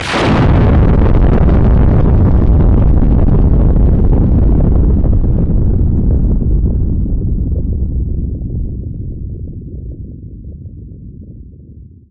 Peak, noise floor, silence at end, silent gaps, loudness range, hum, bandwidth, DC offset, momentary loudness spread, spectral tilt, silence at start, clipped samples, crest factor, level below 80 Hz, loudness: 0 dBFS; -35 dBFS; 0.25 s; none; 14 LU; none; 7.2 kHz; under 0.1%; 19 LU; -8.5 dB/octave; 0 s; under 0.1%; 10 dB; -14 dBFS; -12 LUFS